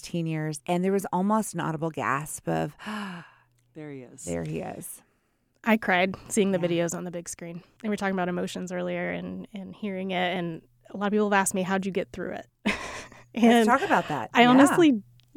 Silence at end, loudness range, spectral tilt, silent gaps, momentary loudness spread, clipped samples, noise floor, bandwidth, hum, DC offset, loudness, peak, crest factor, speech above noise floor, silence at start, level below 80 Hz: 0.35 s; 9 LU; -5 dB/octave; none; 18 LU; under 0.1%; -70 dBFS; 18 kHz; none; under 0.1%; -26 LUFS; -6 dBFS; 22 dB; 45 dB; 0.05 s; -60 dBFS